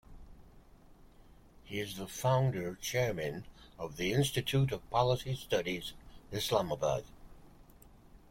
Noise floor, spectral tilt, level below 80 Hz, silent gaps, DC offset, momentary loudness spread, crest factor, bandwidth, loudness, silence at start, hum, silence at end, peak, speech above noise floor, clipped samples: -58 dBFS; -5 dB/octave; -56 dBFS; none; under 0.1%; 12 LU; 20 dB; 16.5 kHz; -34 LUFS; 0.1 s; none; 0.15 s; -14 dBFS; 25 dB; under 0.1%